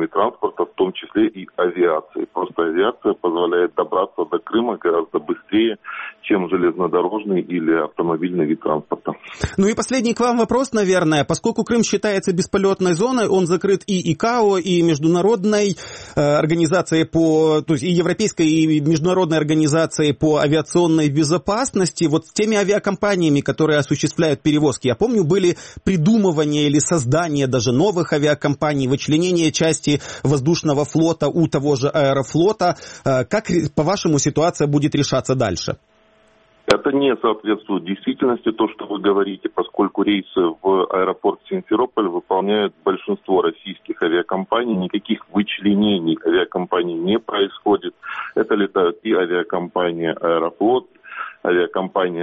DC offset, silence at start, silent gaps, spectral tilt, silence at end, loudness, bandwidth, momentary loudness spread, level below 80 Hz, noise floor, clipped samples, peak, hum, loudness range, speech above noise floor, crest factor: under 0.1%; 0 s; none; -5.5 dB/octave; 0 s; -19 LUFS; 8.8 kHz; 6 LU; -50 dBFS; -55 dBFS; under 0.1%; 0 dBFS; none; 3 LU; 37 dB; 18 dB